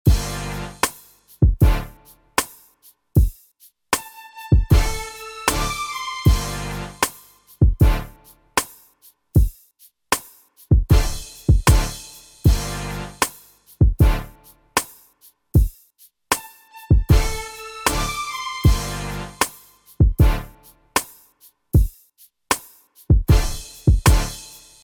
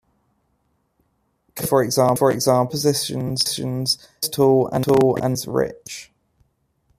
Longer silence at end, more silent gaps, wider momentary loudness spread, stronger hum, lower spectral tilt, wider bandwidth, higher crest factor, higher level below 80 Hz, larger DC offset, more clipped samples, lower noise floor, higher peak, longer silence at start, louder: second, 0.35 s vs 0.95 s; neither; first, 13 LU vs 10 LU; neither; about the same, -5 dB/octave vs -4.5 dB/octave; first, 20 kHz vs 15.5 kHz; about the same, 16 dB vs 18 dB; first, -24 dBFS vs -56 dBFS; neither; neither; second, -55 dBFS vs -68 dBFS; about the same, -4 dBFS vs -4 dBFS; second, 0.05 s vs 1.55 s; about the same, -21 LUFS vs -19 LUFS